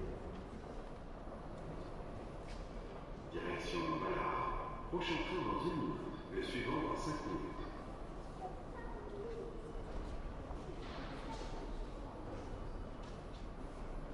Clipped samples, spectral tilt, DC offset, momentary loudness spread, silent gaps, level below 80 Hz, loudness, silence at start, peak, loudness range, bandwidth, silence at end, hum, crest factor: under 0.1%; -6 dB/octave; under 0.1%; 11 LU; none; -50 dBFS; -44 LUFS; 0 s; -26 dBFS; 8 LU; 11.5 kHz; 0 s; none; 18 dB